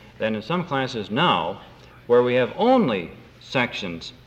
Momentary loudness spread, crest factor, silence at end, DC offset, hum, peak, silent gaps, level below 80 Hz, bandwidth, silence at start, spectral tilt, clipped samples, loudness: 12 LU; 18 dB; 0.15 s; under 0.1%; none; -6 dBFS; none; -56 dBFS; 8.2 kHz; 0.05 s; -6 dB/octave; under 0.1%; -22 LUFS